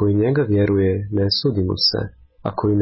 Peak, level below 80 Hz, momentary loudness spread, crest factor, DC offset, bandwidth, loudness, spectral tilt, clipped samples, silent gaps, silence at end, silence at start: -6 dBFS; -38 dBFS; 10 LU; 12 dB; under 0.1%; 6 kHz; -19 LUFS; -9 dB/octave; under 0.1%; none; 0 s; 0 s